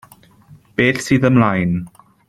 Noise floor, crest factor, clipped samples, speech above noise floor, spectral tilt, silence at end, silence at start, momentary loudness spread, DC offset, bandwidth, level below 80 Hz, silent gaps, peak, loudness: -47 dBFS; 18 dB; under 0.1%; 32 dB; -6.5 dB/octave; 0.4 s; 0.5 s; 12 LU; under 0.1%; 15 kHz; -48 dBFS; none; 0 dBFS; -16 LUFS